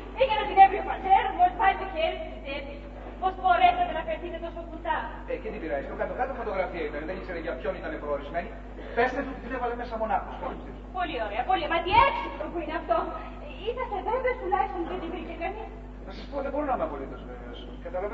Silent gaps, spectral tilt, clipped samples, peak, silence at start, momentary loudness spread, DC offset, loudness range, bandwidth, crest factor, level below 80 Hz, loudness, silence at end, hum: none; -7 dB/octave; under 0.1%; -6 dBFS; 0 s; 17 LU; under 0.1%; 7 LU; 6.2 kHz; 22 dB; -42 dBFS; -28 LUFS; 0 s; 50 Hz at -40 dBFS